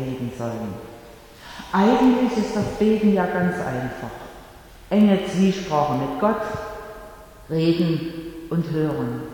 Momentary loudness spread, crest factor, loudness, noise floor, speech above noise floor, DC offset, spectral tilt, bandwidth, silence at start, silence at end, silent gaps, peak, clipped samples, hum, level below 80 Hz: 20 LU; 18 dB; -22 LUFS; -44 dBFS; 23 dB; under 0.1%; -7 dB/octave; 18.5 kHz; 0 s; 0 s; none; -6 dBFS; under 0.1%; none; -48 dBFS